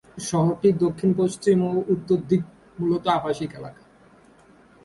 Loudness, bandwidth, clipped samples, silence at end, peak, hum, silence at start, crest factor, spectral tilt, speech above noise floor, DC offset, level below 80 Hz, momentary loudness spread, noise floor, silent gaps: -23 LUFS; 11.5 kHz; under 0.1%; 1.15 s; -6 dBFS; none; 0.15 s; 16 dB; -7 dB/octave; 31 dB; under 0.1%; -58 dBFS; 11 LU; -53 dBFS; none